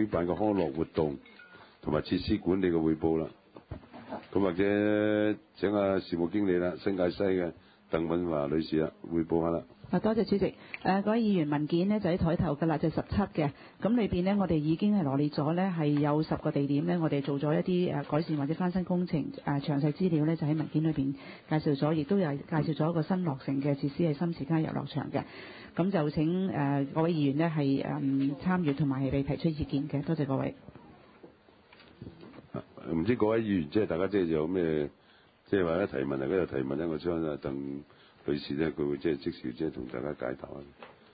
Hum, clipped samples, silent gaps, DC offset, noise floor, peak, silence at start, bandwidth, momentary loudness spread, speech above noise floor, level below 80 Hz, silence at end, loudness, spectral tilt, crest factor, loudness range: none; under 0.1%; none; under 0.1%; -61 dBFS; -14 dBFS; 0 s; 5 kHz; 9 LU; 32 dB; -54 dBFS; 0.25 s; -30 LUFS; -11.5 dB/octave; 16 dB; 4 LU